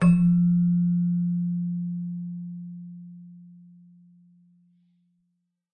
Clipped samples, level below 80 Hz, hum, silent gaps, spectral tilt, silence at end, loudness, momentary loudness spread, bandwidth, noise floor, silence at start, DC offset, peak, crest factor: under 0.1%; -56 dBFS; none; none; -10 dB/octave; 2.3 s; -24 LUFS; 23 LU; 2.8 kHz; -76 dBFS; 0 s; under 0.1%; -10 dBFS; 16 dB